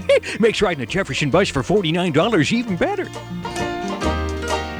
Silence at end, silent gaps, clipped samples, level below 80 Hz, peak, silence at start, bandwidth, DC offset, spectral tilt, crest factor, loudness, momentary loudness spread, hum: 0 s; none; under 0.1%; -36 dBFS; -4 dBFS; 0 s; over 20 kHz; under 0.1%; -5 dB/octave; 16 dB; -20 LUFS; 8 LU; none